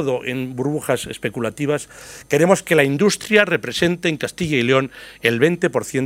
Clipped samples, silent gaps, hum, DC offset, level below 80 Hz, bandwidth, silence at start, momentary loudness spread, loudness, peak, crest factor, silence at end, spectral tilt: under 0.1%; none; none; under 0.1%; -54 dBFS; 16 kHz; 0 s; 10 LU; -19 LUFS; 0 dBFS; 20 dB; 0 s; -5 dB/octave